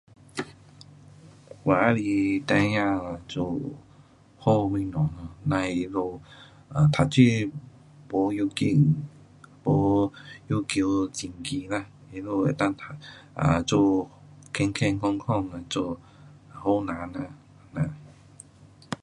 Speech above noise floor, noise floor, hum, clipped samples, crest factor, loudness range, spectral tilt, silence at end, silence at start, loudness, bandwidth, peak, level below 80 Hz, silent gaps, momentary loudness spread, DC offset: 29 dB; -54 dBFS; none; under 0.1%; 22 dB; 4 LU; -6.5 dB/octave; 0.1 s; 0.35 s; -26 LUFS; 11.5 kHz; -4 dBFS; -50 dBFS; none; 17 LU; under 0.1%